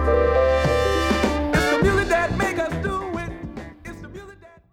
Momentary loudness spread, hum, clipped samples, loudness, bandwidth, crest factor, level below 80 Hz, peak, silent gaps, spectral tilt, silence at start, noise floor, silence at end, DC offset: 19 LU; none; under 0.1%; -21 LUFS; 16.5 kHz; 16 dB; -32 dBFS; -6 dBFS; none; -5.5 dB/octave; 0 s; -45 dBFS; 0.25 s; under 0.1%